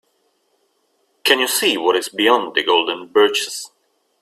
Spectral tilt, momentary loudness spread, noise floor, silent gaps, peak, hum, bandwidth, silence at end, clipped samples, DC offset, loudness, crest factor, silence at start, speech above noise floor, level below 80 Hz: -1 dB/octave; 8 LU; -65 dBFS; none; 0 dBFS; none; 16 kHz; 0.55 s; under 0.1%; under 0.1%; -16 LUFS; 20 dB; 1.25 s; 48 dB; -66 dBFS